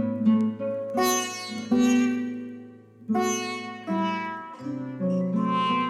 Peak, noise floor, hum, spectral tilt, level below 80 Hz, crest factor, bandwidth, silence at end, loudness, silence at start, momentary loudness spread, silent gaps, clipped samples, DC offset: -12 dBFS; -46 dBFS; none; -4.5 dB/octave; -72 dBFS; 14 dB; 15.5 kHz; 0 s; -26 LUFS; 0 s; 12 LU; none; under 0.1%; under 0.1%